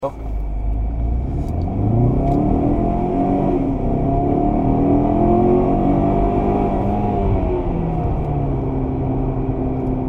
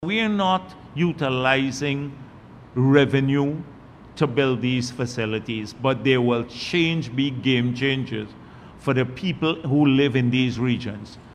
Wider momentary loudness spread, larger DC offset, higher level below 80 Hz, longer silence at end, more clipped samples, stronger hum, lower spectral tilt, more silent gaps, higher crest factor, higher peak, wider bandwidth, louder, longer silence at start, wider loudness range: second, 7 LU vs 13 LU; neither; first, -24 dBFS vs -54 dBFS; about the same, 0 s vs 0 s; neither; neither; first, -11.5 dB/octave vs -6.5 dB/octave; neither; second, 14 dB vs 20 dB; about the same, -4 dBFS vs -2 dBFS; second, 4 kHz vs 10 kHz; first, -19 LUFS vs -22 LUFS; about the same, 0 s vs 0 s; about the same, 3 LU vs 2 LU